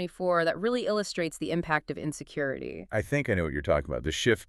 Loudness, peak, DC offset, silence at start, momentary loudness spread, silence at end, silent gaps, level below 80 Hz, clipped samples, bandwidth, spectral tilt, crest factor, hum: -29 LUFS; -10 dBFS; under 0.1%; 0 s; 7 LU; 0.05 s; none; -48 dBFS; under 0.1%; 13.5 kHz; -5 dB/octave; 20 dB; none